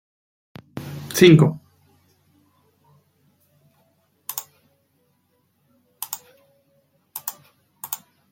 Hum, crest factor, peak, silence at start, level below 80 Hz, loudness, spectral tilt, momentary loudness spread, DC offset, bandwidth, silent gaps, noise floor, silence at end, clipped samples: none; 24 dB; -2 dBFS; 0.75 s; -62 dBFS; -20 LUFS; -5.5 dB/octave; 25 LU; under 0.1%; 17 kHz; none; -67 dBFS; 0.35 s; under 0.1%